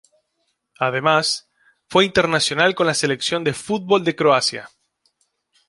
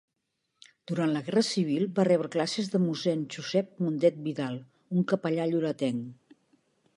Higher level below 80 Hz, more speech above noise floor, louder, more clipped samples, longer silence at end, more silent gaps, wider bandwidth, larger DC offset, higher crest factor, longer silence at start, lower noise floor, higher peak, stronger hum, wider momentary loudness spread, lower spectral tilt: first, -56 dBFS vs -78 dBFS; about the same, 53 dB vs 53 dB; first, -19 LUFS vs -29 LUFS; neither; first, 1 s vs 0.85 s; neither; about the same, 11.5 kHz vs 11.5 kHz; neither; about the same, 20 dB vs 18 dB; about the same, 0.8 s vs 0.9 s; second, -72 dBFS vs -81 dBFS; first, -2 dBFS vs -10 dBFS; neither; about the same, 7 LU vs 8 LU; second, -3.5 dB/octave vs -6 dB/octave